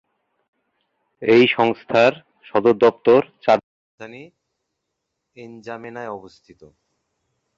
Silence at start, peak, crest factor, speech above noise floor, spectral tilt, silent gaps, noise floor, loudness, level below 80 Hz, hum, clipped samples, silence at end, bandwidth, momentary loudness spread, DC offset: 1.2 s; -2 dBFS; 18 dB; 60 dB; -6.5 dB/octave; 3.63-3.98 s; -78 dBFS; -17 LUFS; -64 dBFS; none; under 0.1%; 1.3 s; 7.2 kHz; 22 LU; under 0.1%